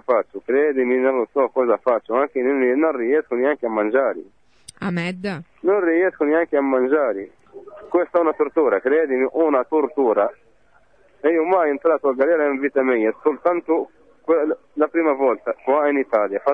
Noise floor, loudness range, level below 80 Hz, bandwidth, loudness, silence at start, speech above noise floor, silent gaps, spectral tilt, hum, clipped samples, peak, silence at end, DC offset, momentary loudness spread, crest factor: -58 dBFS; 2 LU; -66 dBFS; 9.8 kHz; -20 LUFS; 0.1 s; 39 dB; none; -7.5 dB/octave; none; under 0.1%; -6 dBFS; 0 s; 0.1%; 6 LU; 14 dB